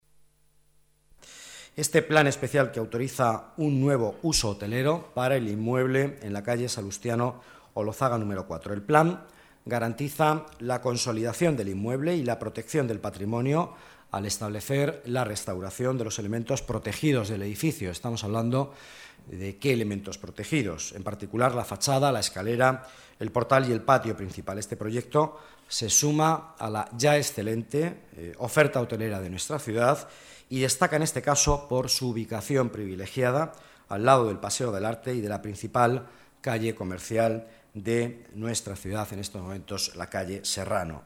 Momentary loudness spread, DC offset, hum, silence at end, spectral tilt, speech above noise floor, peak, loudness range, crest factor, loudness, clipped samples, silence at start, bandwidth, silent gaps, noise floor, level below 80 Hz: 12 LU; under 0.1%; none; 0.05 s; -4.5 dB/octave; 36 dB; -6 dBFS; 5 LU; 22 dB; -27 LUFS; under 0.1%; 1.25 s; 18 kHz; none; -63 dBFS; -52 dBFS